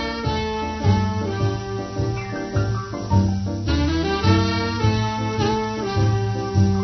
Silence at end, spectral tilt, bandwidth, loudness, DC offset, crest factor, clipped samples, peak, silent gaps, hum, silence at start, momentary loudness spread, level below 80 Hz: 0 s; -6.5 dB/octave; 6.4 kHz; -22 LUFS; under 0.1%; 16 dB; under 0.1%; -4 dBFS; none; none; 0 s; 6 LU; -34 dBFS